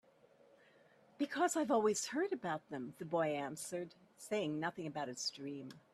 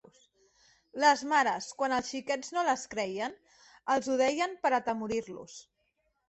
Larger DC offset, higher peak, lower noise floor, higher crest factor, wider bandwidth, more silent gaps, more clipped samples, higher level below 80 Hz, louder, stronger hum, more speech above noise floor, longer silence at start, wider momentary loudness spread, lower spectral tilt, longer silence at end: neither; second, -22 dBFS vs -10 dBFS; second, -68 dBFS vs -77 dBFS; about the same, 18 dB vs 22 dB; first, 14.5 kHz vs 8.4 kHz; neither; neither; second, -84 dBFS vs -70 dBFS; second, -39 LUFS vs -30 LUFS; neither; second, 29 dB vs 47 dB; first, 1.2 s vs 0.95 s; second, 14 LU vs 17 LU; first, -4 dB/octave vs -2.5 dB/octave; second, 0.15 s vs 0.65 s